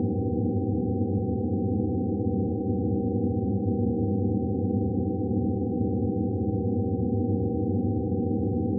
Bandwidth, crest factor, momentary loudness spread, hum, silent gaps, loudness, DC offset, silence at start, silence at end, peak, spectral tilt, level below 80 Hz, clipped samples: 0.9 kHz; 12 dB; 1 LU; none; none; -27 LUFS; under 0.1%; 0 s; 0 s; -14 dBFS; -18 dB/octave; -46 dBFS; under 0.1%